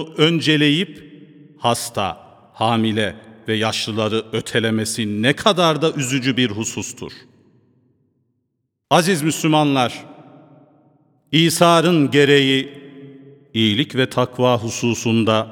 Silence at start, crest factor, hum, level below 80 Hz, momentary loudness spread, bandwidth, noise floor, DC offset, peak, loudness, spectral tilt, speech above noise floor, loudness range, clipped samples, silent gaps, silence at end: 0 s; 20 dB; none; -60 dBFS; 12 LU; 19 kHz; -73 dBFS; under 0.1%; 0 dBFS; -18 LUFS; -4.5 dB/octave; 56 dB; 5 LU; under 0.1%; none; 0 s